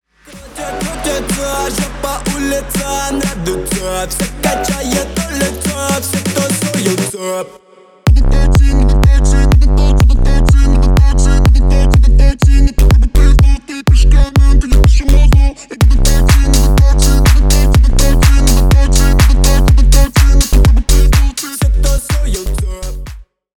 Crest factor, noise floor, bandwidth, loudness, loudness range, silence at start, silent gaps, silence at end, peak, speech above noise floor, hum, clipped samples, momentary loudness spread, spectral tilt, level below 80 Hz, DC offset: 8 dB; -35 dBFS; 18 kHz; -12 LUFS; 6 LU; 0.35 s; none; 0.4 s; 0 dBFS; 19 dB; none; under 0.1%; 8 LU; -5 dB/octave; -10 dBFS; under 0.1%